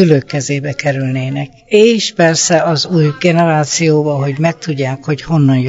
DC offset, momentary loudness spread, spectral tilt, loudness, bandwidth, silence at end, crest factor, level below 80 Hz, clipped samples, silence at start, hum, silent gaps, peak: under 0.1%; 8 LU; -5 dB/octave; -13 LUFS; 8 kHz; 0 s; 12 dB; -50 dBFS; 0.2%; 0 s; none; none; 0 dBFS